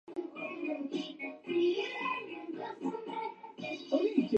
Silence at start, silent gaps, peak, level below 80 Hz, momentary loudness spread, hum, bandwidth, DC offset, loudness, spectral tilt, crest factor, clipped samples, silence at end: 0.05 s; none; -16 dBFS; -88 dBFS; 11 LU; none; 8.2 kHz; under 0.1%; -36 LUFS; -5.5 dB/octave; 18 dB; under 0.1%; 0 s